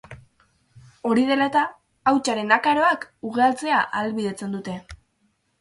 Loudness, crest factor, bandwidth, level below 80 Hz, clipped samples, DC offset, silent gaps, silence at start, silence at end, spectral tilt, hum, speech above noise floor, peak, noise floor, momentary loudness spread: -22 LUFS; 22 dB; 11.5 kHz; -58 dBFS; under 0.1%; under 0.1%; none; 0.1 s; 0.65 s; -4.5 dB/octave; none; 47 dB; -2 dBFS; -68 dBFS; 11 LU